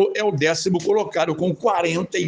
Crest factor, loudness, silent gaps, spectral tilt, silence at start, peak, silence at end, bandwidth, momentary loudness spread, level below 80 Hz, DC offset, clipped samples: 14 dB; -21 LUFS; none; -5 dB/octave; 0 s; -6 dBFS; 0 s; 10 kHz; 2 LU; -62 dBFS; under 0.1%; under 0.1%